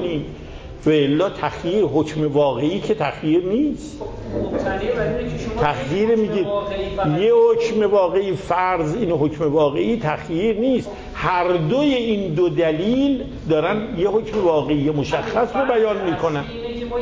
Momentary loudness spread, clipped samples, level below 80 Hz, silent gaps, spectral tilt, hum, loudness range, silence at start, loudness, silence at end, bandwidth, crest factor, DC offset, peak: 8 LU; under 0.1%; -40 dBFS; none; -7 dB/octave; none; 3 LU; 0 s; -20 LUFS; 0 s; 8 kHz; 14 dB; under 0.1%; -6 dBFS